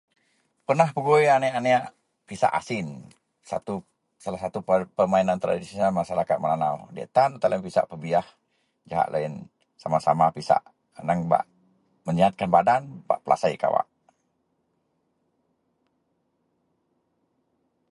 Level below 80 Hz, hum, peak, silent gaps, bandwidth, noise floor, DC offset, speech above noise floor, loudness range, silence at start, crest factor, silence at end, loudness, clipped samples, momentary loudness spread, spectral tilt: -62 dBFS; none; -6 dBFS; none; 11.5 kHz; -73 dBFS; under 0.1%; 49 dB; 5 LU; 0.7 s; 20 dB; 4.05 s; -24 LUFS; under 0.1%; 15 LU; -6.5 dB/octave